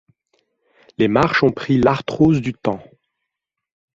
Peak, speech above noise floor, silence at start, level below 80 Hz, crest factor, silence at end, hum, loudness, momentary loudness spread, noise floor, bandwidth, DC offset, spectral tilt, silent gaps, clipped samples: -2 dBFS; 65 dB; 1 s; -48 dBFS; 18 dB; 1.15 s; none; -17 LUFS; 10 LU; -81 dBFS; 7.6 kHz; under 0.1%; -7.5 dB/octave; none; under 0.1%